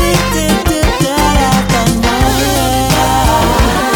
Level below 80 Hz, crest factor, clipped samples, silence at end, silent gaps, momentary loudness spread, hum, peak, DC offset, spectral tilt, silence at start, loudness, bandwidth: -18 dBFS; 10 dB; under 0.1%; 0 s; none; 2 LU; none; 0 dBFS; under 0.1%; -4.5 dB/octave; 0 s; -11 LUFS; over 20 kHz